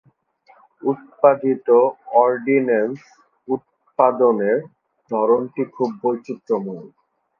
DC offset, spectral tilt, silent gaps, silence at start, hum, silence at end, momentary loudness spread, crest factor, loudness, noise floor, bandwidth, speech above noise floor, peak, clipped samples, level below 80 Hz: under 0.1%; -9 dB/octave; none; 0.85 s; none; 0.55 s; 11 LU; 20 dB; -19 LUFS; -55 dBFS; 6.2 kHz; 37 dB; 0 dBFS; under 0.1%; -72 dBFS